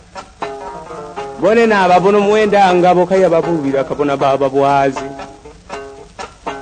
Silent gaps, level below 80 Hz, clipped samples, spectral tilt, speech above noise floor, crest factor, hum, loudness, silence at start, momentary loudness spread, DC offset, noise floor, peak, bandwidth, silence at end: none; -46 dBFS; under 0.1%; -6 dB/octave; 23 dB; 14 dB; none; -12 LUFS; 0.15 s; 20 LU; under 0.1%; -35 dBFS; 0 dBFS; 9.6 kHz; 0 s